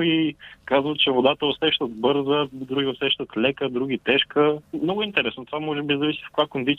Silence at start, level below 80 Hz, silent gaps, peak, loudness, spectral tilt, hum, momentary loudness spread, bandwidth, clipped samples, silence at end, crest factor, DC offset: 0 s; -60 dBFS; none; -6 dBFS; -23 LUFS; -7 dB/octave; none; 7 LU; 4.3 kHz; under 0.1%; 0 s; 18 dB; under 0.1%